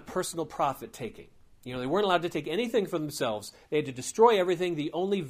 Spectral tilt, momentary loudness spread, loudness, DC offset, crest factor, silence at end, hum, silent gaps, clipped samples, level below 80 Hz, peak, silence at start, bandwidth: -4.5 dB/octave; 16 LU; -29 LUFS; under 0.1%; 20 dB; 0 s; none; none; under 0.1%; -62 dBFS; -8 dBFS; 0 s; 15.5 kHz